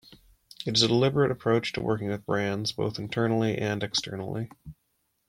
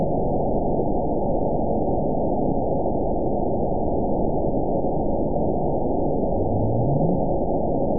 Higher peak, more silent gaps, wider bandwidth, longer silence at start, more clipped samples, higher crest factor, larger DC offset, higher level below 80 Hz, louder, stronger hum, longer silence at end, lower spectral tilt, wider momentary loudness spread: about the same, -8 dBFS vs -10 dBFS; neither; first, 16 kHz vs 1 kHz; about the same, 0.1 s vs 0 s; neither; first, 20 dB vs 14 dB; second, under 0.1% vs 5%; second, -58 dBFS vs -34 dBFS; second, -27 LUFS vs -23 LUFS; neither; first, 0.55 s vs 0 s; second, -5 dB/octave vs -19 dB/octave; first, 12 LU vs 2 LU